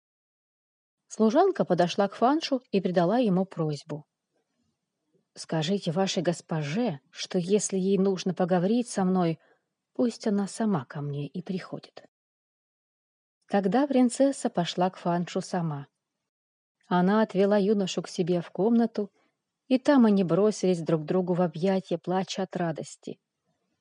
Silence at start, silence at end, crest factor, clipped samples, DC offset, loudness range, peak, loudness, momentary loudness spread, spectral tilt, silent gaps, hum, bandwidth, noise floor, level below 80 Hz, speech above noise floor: 1.1 s; 0.7 s; 16 dB; under 0.1%; under 0.1%; 6 LU; -10 dBFS; -27 LUFS; 12 LU; -6 dB/octave; 12.08-13.41 s, 16.29-16.75 s; none; 10.5 kHz; -78 dBFS; -78 dBFS; 53 dB